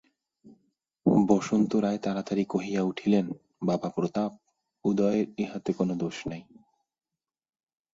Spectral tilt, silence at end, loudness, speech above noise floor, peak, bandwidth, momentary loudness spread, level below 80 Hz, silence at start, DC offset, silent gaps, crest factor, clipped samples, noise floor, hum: -7 dB/octave; 1.5 s; -28 LUFS; over 63 dB; -8 dBFS; 7.8 kHz; 9 LU; -64 dBFS; 0.45 s; under 0.1%; none; 20 dB; under 0.1%; under -90 dBFS; none